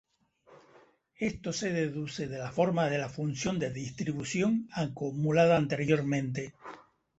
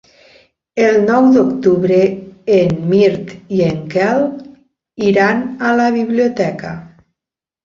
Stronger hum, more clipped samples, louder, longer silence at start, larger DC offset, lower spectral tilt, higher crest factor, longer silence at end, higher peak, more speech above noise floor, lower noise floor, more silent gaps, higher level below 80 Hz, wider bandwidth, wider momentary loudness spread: neither; neither; second, -31 LUFS vs -14 LUFS; second, 0.5 s vs 0.75 s; neither; about the same, -6 dB/octave vs -7 dB/octave; first, 20 dB vs 14 dB; second, 0.4 s vs 0.75 s; second, -12 dBFS vs -2 dBFS; second, 33 dB vs 74 dB; second, -63 dBFS vs -87 dBFS; neither; second, -62 dBFS vs -52 dBFS; first, 8.2 kHz vs 7.4 kHz; second, 11 LU vs 14 LU